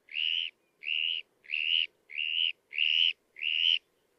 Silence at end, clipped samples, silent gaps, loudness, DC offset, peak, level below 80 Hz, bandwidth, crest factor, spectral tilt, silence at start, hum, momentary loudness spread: 0.4 s; under 0.1%; none; -28 LUFS; under 0.1%; -16 dBFS; under -90 dBFS; 6.6 kHz; 16 dB; 3 dB/octave; 0.1 s; none; 10 LU